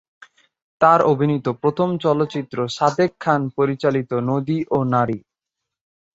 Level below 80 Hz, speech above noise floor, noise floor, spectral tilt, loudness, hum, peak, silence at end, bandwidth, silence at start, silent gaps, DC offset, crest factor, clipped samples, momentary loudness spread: -60 dBFS; 64 dB; -83 dBFS; -7 dB/octave; -19 LUFS; none; -2 dBFS; 0.95 s; 8 kHz; 0.8 s; none; under 0.1%; 18 dB; under 0.1%; 7 LU